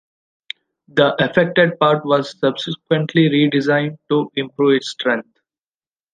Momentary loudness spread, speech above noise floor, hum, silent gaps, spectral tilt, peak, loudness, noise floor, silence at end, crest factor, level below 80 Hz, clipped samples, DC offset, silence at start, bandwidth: 10 LU; over 73 dB; none; none; -6.5 dB/octave; -2 dBFS; -17 LUFS; under -90 dBFS; 0.95 s; 16 dB; -60 dBFS; under 0.1%; under 0.1%; 0.95 s; 9.4 kHz